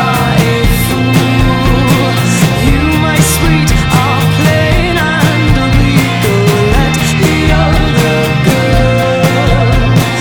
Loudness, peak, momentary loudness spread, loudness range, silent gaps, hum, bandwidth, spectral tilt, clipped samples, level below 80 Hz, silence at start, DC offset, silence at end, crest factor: -9 LUFS; 0 dBFS; 1 LU; 0 LU; none; none; over 20 kHz; -5.5 dB/octave; under 0.1%; -18 dBFS; 0 s; under 0.1%; 0 s; 8 dB